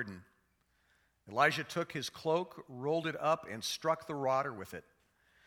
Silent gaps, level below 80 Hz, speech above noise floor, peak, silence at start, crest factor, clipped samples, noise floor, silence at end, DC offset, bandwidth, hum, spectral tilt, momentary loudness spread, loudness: none; -76 dBFS; 40 dB; -14 dBFS; 0 s; 24 dB; under 0.1%; -75 dBFS; 0.65 s; under 0.1%; 19 kHz; none; -4 dB/octave; 15 LU; -35 LUFS